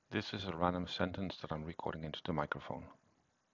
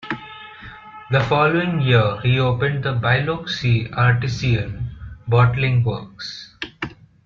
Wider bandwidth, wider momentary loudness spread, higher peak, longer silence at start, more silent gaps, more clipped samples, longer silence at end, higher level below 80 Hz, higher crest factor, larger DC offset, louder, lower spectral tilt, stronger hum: about the same, 7.6 kHz vs 7 kHz; second, 8 LU vs 17 LU; second, -16 dBFS vs -2 dBFS; about the same, 0.1 s vs 0 s; neither; neither; first, 0.6 s vs 0.35 s; second, -58 dBFS vs -44 dBFS; first, 24 dB vs 16 dB; neither; second, -40 LUFS vs -19 LUFS; about the same, -6.5 dB/octave vs -7 dB/octave; neither